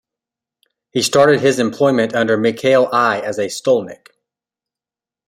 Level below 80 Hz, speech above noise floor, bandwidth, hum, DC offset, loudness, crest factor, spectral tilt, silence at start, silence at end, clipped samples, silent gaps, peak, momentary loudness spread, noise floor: -60 dBFS; 75 dB; 16 kHz; none; under 0.1%; -15 LUFS; 16 dB; -4.5 dB/octave; 0.95 s; 1.3 s; under 0.1%; none; -2 dBFS; 8 LU; -90 dBFS